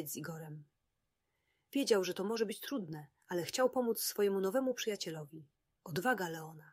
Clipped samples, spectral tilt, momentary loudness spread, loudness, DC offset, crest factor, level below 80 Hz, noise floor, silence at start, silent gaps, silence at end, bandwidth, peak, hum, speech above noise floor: under 0.1%; -4 dB/octave; 16 LU; -36 LUFS; under 0.1%; 20 dB; -82 dBFS; -85 dBFS; 0 s; none; 0.05 s; 16 kHz; -18 dBFS; none; 49 dB